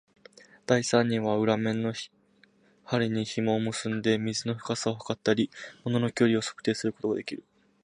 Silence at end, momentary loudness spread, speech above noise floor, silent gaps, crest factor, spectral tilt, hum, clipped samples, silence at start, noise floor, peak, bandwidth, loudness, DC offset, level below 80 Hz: 0.45 s; 8 LU; 35 dB; none; 22 dB; -5 dB/octave; none; under 0.1%; 0.7 s; -63 dBFS; -8 dBFS; 11 kHz; -28 LUFS; under 0.1%; -68 dBFS